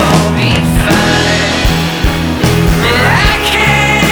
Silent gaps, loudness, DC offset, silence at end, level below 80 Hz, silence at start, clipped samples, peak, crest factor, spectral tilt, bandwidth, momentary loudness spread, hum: none; -10 LUFS; under 0.1%; 0 s; -20 dBFS; 0 s; under 0.1%; 0 dBFS; 10 dB; -4.5 dB/octave; over 20 kHz; 4 LU; none